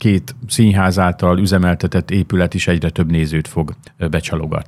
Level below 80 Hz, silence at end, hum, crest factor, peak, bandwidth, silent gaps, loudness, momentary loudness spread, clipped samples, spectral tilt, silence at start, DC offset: -34 dBFS; 0.05 s; none; 16 dB; 0 dBFS; 14 kHz; none; -16 LUFS; 8 LU; under 0.1%; -6.5 dB/octave; 0 s; under 0.1%